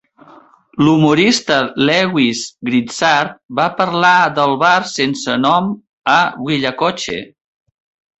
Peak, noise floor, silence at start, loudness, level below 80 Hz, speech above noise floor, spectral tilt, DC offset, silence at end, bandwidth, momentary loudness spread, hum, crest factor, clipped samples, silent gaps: 0 dBFS; -45 dBFS; 0.75 s; -14 LUFS; -54 dBFS; 30 dB; -4.5 dB/octave; under 0.1%; 0.95 s; 8.2 kHz; 10 LU; none; 14 dB; under 0.1%; 3.45-3.49 s, 5.93-5.98 s